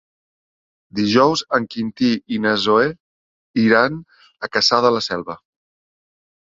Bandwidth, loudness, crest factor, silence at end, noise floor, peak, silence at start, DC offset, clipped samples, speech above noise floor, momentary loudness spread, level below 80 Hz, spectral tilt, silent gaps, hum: 7.8 kHz; -18 LUFS; 18 dB; 1.15 s; under -90 dBFS; -2 dBFS; 0.95 s; under 0.1%; under 0.1%; over 72 dB; 14 LU; -58 dBFS; -4.5 dB/octave; 3.00-3.54 s; none